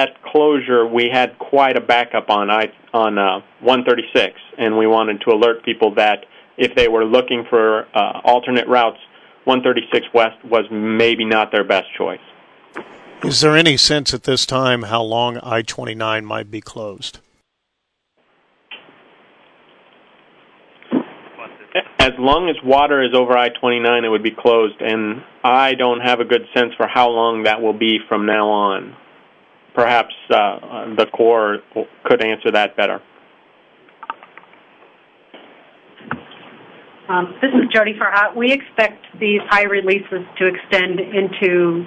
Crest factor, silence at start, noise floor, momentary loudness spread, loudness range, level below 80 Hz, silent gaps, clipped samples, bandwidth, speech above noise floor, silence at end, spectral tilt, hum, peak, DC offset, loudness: 18 dB; 0 s; -74 dBFS; 12 LU; 12 LU; -48 dBFS; none; under 0.1%; 11 kHz; 58 dB; 0 s; -4 dB/octave; none; 0 dBFS; under 0.1%; -16 LUFS